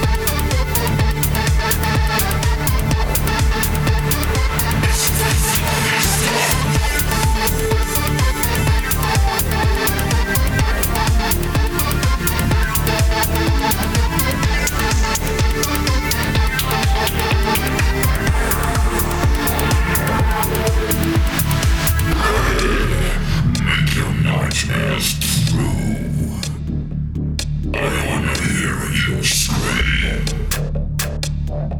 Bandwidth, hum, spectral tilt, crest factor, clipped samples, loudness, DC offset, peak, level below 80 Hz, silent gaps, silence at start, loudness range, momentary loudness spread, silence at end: over 20 kHz; none; -4 dB/octave; 16 dB; under 0.1%; -17 LUFS; under 0.1%; 0 dBFS; -22 dBFS; none; 0 s; 3 LU; 5 LU; 0 s